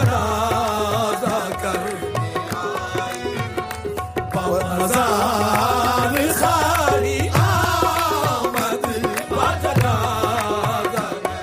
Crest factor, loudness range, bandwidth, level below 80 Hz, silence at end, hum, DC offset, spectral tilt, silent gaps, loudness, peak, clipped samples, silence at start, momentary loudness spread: 18 dB; 6 LU; 15.5 kHz; -40 dBFS; 0 s; none; under 0.1%; -4.5 dB/octave; none; -20 LUFS; -2 dBFS; under 0.1%; 0 s; 8 LU